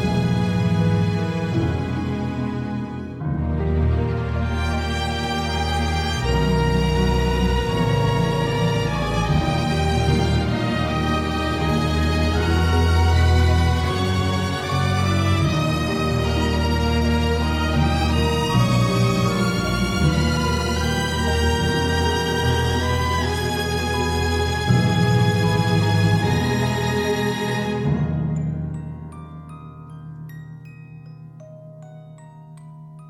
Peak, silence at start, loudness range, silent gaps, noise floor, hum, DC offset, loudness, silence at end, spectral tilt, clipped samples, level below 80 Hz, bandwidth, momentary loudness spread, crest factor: -6 dBFS; 0 s; 6 LU; none; -41 dBFS; none; under 0.1%; -21 LUFS; 0 s; -6 dB/octave; under 0.1%; -28 dBFS; 15 kHz; 16 LU; 16 dB